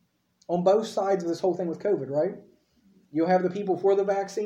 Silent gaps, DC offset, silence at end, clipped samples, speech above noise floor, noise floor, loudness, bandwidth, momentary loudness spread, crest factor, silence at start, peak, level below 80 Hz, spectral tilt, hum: none; under 0.1%; 0 s; under 0.1%; 37 dB; -62 dBFS; -26 LUFS; 10.5 kHz; 7 LU; 16 dB; 0.5 s; -10 dBFS; -74 dBFS; -6.5 dB/octave; none